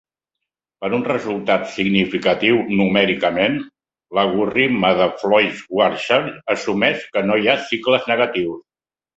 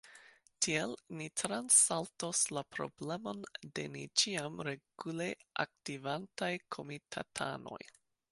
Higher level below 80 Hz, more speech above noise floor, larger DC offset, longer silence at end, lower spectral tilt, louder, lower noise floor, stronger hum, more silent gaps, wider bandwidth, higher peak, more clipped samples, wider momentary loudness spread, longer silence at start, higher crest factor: first, -56 dBFS vs -76 dBFS; first, 64 dB vs 24 dB; neither; first, 0.6 s vs 0.45 s; first, -5.5 dB/octave vs -2 dB/octave; first, -18 LUFS vs -35 LUFS; first, -82 dBFS vs -62 dBFS; neither; neither; second, 8 kHz vs 12 kHz; first, 0 dBFS vs -14 dBFS; neither; second, 7 LU vs 14 LU; first, 0.8 s vs 0.05 s; second, 18 dB vs 24 dB